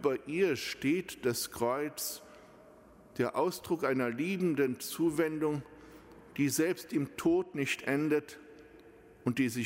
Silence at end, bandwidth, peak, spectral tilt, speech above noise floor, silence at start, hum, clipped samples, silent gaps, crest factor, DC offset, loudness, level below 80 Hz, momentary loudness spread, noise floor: 0 s; 16 kHz; -18 dBFS; -5 dB/octave; 25 dB; 0 s; none; under 0.1%; none; 16 dB; under 0.1%; -33 LUFS; -68 dBFS; 8 LU; -57 dBFS